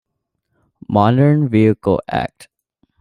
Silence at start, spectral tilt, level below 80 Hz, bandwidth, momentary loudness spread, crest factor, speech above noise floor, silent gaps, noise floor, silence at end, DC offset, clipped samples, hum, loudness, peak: 0.9 s; -9 dB/octave; -50 dBFS; 11 kHz; 10 LU; 16 dB; 59 dB; none; -74 dBFS; 0.75 s; under 0.1%; under 0.1%; none; -15 LUFS; -2 dBFS